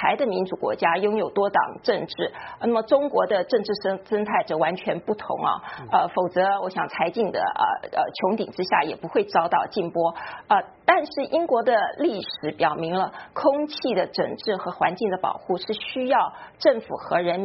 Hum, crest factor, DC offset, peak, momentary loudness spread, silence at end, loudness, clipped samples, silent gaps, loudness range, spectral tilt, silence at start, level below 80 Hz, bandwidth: none; 20 dB; under 0.1%; -4 dBFS; 6 LU; 0 s; -24 LUFS; under 0.1%; none; 2 LU; -3 dB/octave; 0 s; -66 dBFS; 6 kHz